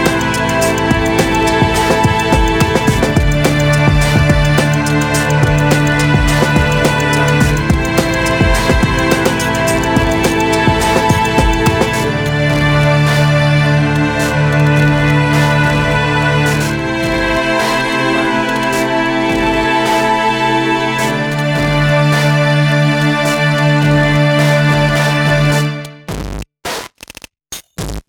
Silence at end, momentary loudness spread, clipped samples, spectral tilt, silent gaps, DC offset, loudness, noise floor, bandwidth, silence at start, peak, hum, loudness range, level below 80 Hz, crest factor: 0.1 s; 4 LU; under 0.1%; -5.5 dB/octave; none; under 0.1%; -12 LUFS; -36 dBFS; 18.5 kHz; 0 s; 0 dBFS; none; 2 LU; -24 dBFS; 12 dB